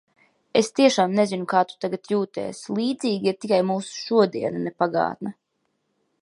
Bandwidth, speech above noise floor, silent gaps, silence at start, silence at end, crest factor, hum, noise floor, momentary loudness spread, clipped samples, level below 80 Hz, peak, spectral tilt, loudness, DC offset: 11.5 kHz; 51 dB; none; 0.55 s; 0.9 s; 20 dB; none; -74 dBFS; 10 LU; under 0.1%; -70 dBFS; -4 dBFS; -5 dB/octave; -23 LUFS; under 0.1%